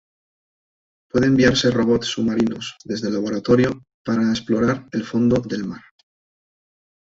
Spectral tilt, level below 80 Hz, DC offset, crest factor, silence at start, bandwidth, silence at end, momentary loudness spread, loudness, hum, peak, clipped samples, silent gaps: -5.5 dB/octave; -48 dBFS; under 0.1%; 18 dB; 1.15 s; 7.8 kHz; 1.25 s; 12 LU; -20 LUFS; none; -4 dBFS; under 0.1%; 3.94-4.05 s